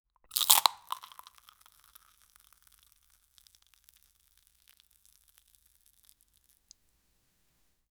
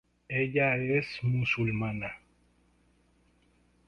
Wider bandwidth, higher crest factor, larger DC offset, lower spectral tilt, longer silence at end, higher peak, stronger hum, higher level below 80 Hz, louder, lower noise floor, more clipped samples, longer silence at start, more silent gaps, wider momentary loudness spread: first, over 20 kHz vs 6.8 kHz; first, 38 dB vs 18 dB; neither; second, 3.5 dB/octave vs -8 dB/octave; first, 7 s vs 1.7 s; first, 0 dBFS vs -14 dBFS; second, none vs 60 Hz at -55 dBFS; second, -76 dBFS vs -60 dBFS; first, -26 LUFS vs -30 LUFS; first, -73 dBFS vs -67 dBFS; neither; about the same, 0.35 s vs 0.3 s; neither; first, 28 LU vs 11 LU